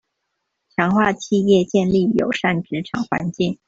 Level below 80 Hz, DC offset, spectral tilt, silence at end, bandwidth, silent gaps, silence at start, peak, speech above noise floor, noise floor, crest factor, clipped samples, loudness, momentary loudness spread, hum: -52 dBFS; under 0.1%; -6.5 dB/octave; 0.15 s; 7.8 kHz; none; 0.8 s; -2 dBFS; 57 dB; -76 dBFS; 16 dB; under 0.1%; -19 LUFS; 8 LU; none